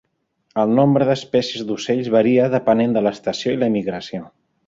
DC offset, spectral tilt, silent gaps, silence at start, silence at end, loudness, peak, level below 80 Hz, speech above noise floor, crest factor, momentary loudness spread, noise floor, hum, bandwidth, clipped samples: under 0.1%; -6.5 dB/octave; none; 0.55 s; 0.4 s; -18 LUFS; -2 dBFS; -58 dBFS; 48 dB; 16 dB; 11 LU; -66 dBFS; none; 7.8 kHz; under 0.1%